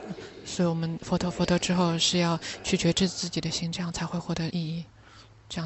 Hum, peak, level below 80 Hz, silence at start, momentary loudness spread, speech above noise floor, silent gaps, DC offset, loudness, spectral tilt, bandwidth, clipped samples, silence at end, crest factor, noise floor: none; -12 dBFS; -52 dBFS; 0 s; 13 LU; 25 dB; none; under 0.1%; -27 LUFS; -4.5 dB/octave; 8.4 kHz; under 0.1%; 0 s; 16 dB; -52 dBFS